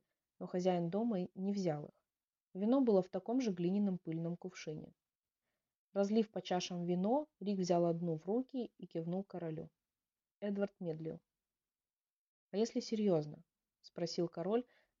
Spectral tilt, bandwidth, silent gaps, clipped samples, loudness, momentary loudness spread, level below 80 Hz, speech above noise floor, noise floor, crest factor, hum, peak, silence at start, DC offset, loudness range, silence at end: -7 dB/octave; 7.4 kHz; 5.78-5.90 s, 11.96-12.00 s, 12.16-12.49 s; under 0.1%; -38 LUFS; 13 LU; -82 dBFS; over 53 dB; under -90 dBFS; 18 dB; none; -20 dBFS; 0.4 s; under 0.1%; 7 LU; 0.35 s